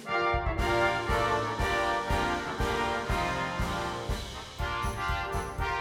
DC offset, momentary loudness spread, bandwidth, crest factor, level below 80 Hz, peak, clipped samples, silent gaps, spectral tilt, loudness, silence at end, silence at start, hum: under 0.1%; 7 LU; 17 kHz; 16 dB; -38 dBFS; -14 dBFS; under 0.1%; none; -5 dB/octave; -30 LUFS; 0 s; 0 s; none